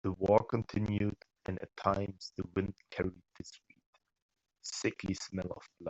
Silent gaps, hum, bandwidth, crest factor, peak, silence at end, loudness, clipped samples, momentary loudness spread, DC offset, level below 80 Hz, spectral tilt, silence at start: 3.86-3.93 s, 4.22-4.29 s; none; 8.2 kHz; 24 dB; -12 dBFS; 0 s; -36 LUFS; under 0.1%; 17 LU; under 0.1%; -60 dBFS; -6 dB/octave; 0.05 s